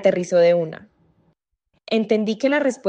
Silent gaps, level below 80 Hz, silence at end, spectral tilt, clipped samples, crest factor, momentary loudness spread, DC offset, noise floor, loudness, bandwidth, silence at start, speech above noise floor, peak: none; -70 dBFS; 0 s; -5.5 dB/octave; under 0.1%; 16 dB; 10 LU; under 0.1%; -70 dBFS; -20 LUFS; 9 kHz; 0 s; 51 dB; -4 dBFS